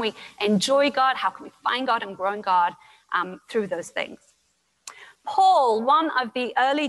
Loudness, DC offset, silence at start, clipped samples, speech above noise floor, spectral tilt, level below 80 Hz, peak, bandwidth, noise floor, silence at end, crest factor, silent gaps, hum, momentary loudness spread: -23 LUFS; under 0.1%; 0 s; under 0.1%; 46 dB; -4 dB/octave; -72 dBFS; -8 dBFS; 12.5 kHz; -69 dBFS; 0 s; 14 dB; none; none; 12 LU